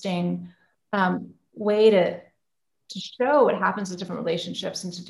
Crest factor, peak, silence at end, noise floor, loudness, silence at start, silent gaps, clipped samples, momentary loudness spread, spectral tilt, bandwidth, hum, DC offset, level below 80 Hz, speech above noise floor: 18 dB; -6 dBFS; 0 s; -83 dBFS; -24 LUFS; 0 s; none; under 0.1%; 17 LU; -5.5 dB/octave; 12 kHz; none; under 0.1%; -72 dBFS; 60 dB